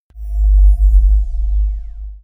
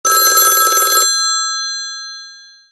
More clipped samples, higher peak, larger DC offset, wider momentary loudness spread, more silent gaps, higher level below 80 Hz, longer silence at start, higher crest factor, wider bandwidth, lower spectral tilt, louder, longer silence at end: neither; about the same, -2 dBFS vs 0 dBFS; neither; second, 14 LU vs 18 LU; neither; first, -12 dBFS vs -68 dBFS; about the same, 0.15 s vs 0.05 s; about the same, 10 dB vs 14 dB; second, 0.8 kHz vs 13 kHz; first, -9 dB/octave vs 3.5 dB/octave; second, -16 LUFS vs -11 LUFS; second, 0.05 s vs 0.3 s